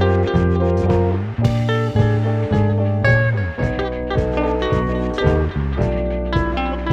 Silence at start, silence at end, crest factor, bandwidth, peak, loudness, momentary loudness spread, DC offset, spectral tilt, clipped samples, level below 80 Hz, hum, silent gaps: 0 s; 0 s; 14 dB; 7.8 kHz; -4 dBFS; -19 LUFS; 5 LU; under 0.1%; -8.5 dB/octave; under 0.1%; -28 dBFS; none; none